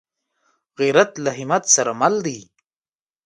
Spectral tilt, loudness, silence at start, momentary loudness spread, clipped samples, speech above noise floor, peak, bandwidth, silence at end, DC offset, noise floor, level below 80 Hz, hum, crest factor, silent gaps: -2.5 dB/octave; -18 LUFS; 0.8 s; 11 LU; under 0.1%; over 71 dB; 0 dBFS; 11.5 kHz; 0.8 s; under 0.1%; under -90 dBFS; -68 dBFS; none; 20 dB; none